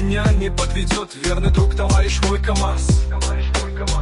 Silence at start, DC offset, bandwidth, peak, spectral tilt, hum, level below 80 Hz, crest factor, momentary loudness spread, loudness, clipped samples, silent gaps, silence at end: 0 s; under 0.1%; 11.5 kHz; -4 dBFS; -5 dB/octave; none; -20 dBFS; 12 dB; 5 LU; -19 LUFS; under 0.1%; none; 0 s